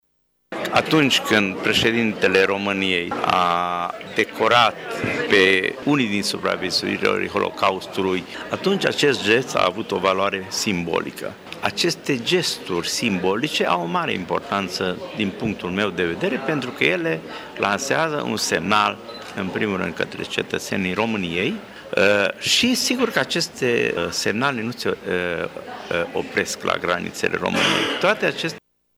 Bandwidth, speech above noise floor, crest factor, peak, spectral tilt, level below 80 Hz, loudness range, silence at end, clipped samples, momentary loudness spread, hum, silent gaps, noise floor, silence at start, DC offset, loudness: over 20 kHz; 47 dB; 22 dB; 0 dBFS; -3.5 dB/octave; -56 dBFS; 4 LU; 0.4 s; under 0.1%; 9 LU; none; none; -68 dBFS; 0.5 s; under 0.1%; -21 LUFS